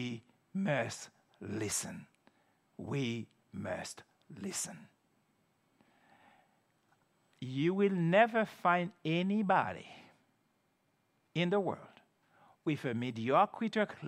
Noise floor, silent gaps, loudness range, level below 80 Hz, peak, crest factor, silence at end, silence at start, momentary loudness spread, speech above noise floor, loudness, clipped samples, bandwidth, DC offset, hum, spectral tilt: -76 dBFS; none; 13 LU; -82 dBFS; -12 dBFS; 24 dB; 0 s; 0 s; 18 LU; 43 dB; -34 LUFS; under 0.1%; 14.5 kHz; under 0.1%; none; -5 dB/octave